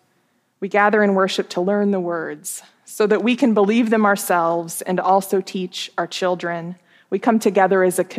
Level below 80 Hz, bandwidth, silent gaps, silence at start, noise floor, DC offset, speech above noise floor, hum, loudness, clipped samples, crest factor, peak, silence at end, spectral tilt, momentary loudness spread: -80 dBFS; 15.5 kHz; none; 0.6 s; -64 dBFS; under 0.1%; 46 dB; none; -19 LUFS; under 0.1%; 18 dB; -2 dBFS; 0 s; -5 dB/octave; 12 LU